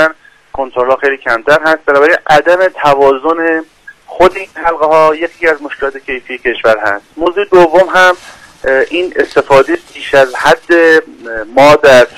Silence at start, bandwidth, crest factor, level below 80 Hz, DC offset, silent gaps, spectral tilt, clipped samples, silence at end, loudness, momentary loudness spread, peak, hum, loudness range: 0 s; 16 kHz; 10 dB; -40 dBFS; under 0.1%; none; -4.5 dB/octave; 0.1%; 0.1 s; -9 LUFS; 11 LU; 0 dBFS; none; 3 LU